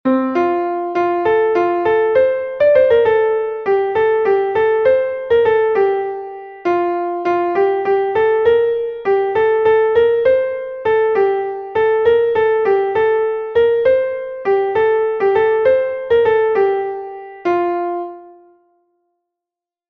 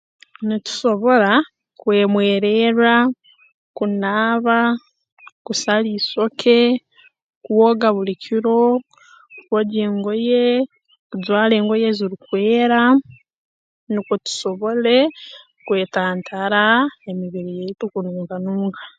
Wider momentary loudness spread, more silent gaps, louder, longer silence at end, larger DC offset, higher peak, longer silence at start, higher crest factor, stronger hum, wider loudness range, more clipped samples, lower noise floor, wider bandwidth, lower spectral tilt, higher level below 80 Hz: second, 8 LU vs 12 LU; second, none vs 3.54-3.74 s, 5.12-5.17 s, 5.32-5.45 s, 7.22-7.41 s, 10.99-11.10 s, 13.35-13.87 s; first, -15 LUFS vs -18 LUFS; first, 1.6 s vs 0.1 s; neither; about the same, -2 dBFS vs 0 dBFS; second, 0.05 s vs 0.4 s; about the same, 14 dB vs 18 dB; neither; about the same, 2 LU vs 4 LU; neither; first, -87 dBFS vs -46 dBFS; second, 5.2 kHz vs 9 kHz; first, -7 dB/octave vs -5 dB/octave; first, -52 dBFS vs -70 dBFS